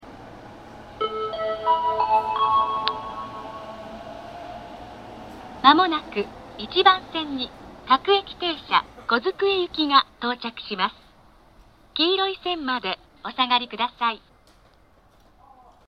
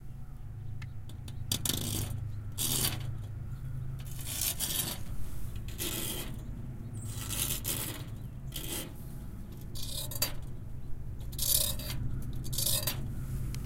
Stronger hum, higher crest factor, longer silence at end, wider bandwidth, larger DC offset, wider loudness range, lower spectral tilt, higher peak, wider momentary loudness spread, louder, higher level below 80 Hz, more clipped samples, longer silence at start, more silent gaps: neither; about the same, 24 dB vs 24 dB; first, 1.7 s vs 0 s; second, 10 kHz vs 17 kHz; neither; about the same, 5 LU vs 4 LU; first, -5 dB/octave vs -3 dB/octave; first, 0 dBFS vs -10 dBFS; first, 21 LU vs 15 LU; first, -23 LUFS vs -35 LUFS; second, -56 dBFS vs -44 dBFS; neither; about the same, 0.05 s vs 0 s; neither